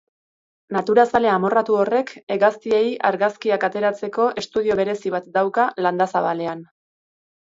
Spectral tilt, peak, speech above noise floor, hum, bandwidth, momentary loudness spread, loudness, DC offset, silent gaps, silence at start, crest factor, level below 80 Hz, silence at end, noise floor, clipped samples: -6 dB/octave; -2 dBFS; over 70 dB; none; 7.8 kHz; 8 LU; -20 LUFS; under 0.1%; 2.23-2.27 s; 0.7 s; 18 dB; -62 dBFS; 0.95 s; under -90 dBFS; under 0.1%